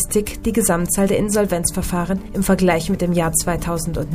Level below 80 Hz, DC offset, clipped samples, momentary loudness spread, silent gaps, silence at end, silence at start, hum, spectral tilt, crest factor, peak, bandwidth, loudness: -32 dBFS; under 0.1%; under 0.1%; 5 LU; none; 0 s; 0 s; none; -5 dB/octave; 16 dB; -2 dBFS; 15.5 kHz; -19 LUFS